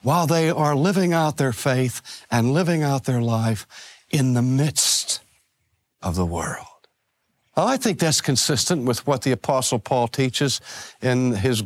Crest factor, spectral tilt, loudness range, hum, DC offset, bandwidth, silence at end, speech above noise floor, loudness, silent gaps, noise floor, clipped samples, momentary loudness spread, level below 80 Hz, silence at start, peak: 16 dB; -4.5 dB/octave; 3 LU; none; under 0.1%; 16 kHz; 0 s; 51 dB; -21 LUFS; none; -72 dBFS; under 0.1%; 9 LU; -52 dBFS; 0.05 s; -6 dBFS